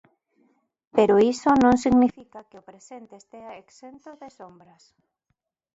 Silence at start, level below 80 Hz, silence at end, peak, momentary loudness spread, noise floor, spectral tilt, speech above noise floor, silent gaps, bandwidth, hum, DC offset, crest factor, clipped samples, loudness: 0.95 s; -54 dBFS; 1.3 s; -4 dBFS; 26 LU; -77 dBFS; -6 dB/octave; 54 dB; none; 8 kHz; none; under 0.1%; 20 dB; under 0.1%; -20 LUFS